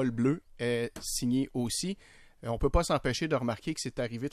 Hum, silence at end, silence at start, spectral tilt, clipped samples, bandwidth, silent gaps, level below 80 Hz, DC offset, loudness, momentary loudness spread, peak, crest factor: none; 0.05 s; 0 s; -5 dB/octave; under 0.1%; 15.5 kHz; none; -42 dBFS; under 0.1%; -31 LUFS; 7 LU; -14 dBFS; 18 dB